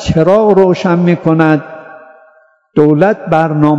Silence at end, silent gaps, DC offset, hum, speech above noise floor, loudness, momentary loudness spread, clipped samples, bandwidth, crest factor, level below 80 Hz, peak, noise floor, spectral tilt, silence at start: 0 s; none; under 0.1%; none; 39 dB; -10 LUFS; 8 LU; 1%; 7.8 kHz; 10 dB; -38 dBFS; 0 dBFS; -48 dBFS; -8 dB/octave; 0 s